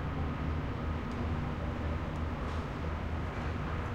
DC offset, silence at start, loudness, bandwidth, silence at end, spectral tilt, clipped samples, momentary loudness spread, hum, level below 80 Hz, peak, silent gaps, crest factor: under 0.1%; 0 s; -37 LUFS; 8.2 kHz; 0 s; -7.5 dB/octave; under 0.1%; 2 LU; none; -42 dBFS; -22 dBFS; none; 12 dB